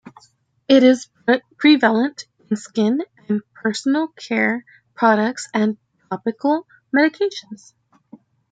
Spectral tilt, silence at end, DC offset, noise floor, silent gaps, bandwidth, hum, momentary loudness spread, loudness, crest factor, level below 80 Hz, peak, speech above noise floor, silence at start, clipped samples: -5 dB/octave; 0.95 s; under 0.1%; -58 dBFS; none; 9.2 kHz; none; 13 LU; -19 LUFS; 18 dB; -70 dBFS; -2 dBFS; 40 dB; 0.05 s; under 0.1%